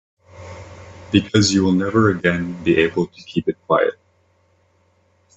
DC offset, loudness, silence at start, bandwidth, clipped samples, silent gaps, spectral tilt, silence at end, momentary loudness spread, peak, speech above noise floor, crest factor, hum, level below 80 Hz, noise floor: under 0.1%; -18 LUFS; 0.35 s; 8.4 kHz; under 0.1%; none; -5.5 dB/octave; 1.45 s; 22 LU; 0 dBFS; 43 dB; 20 dB; none; -52 dBFS; -60 dBFS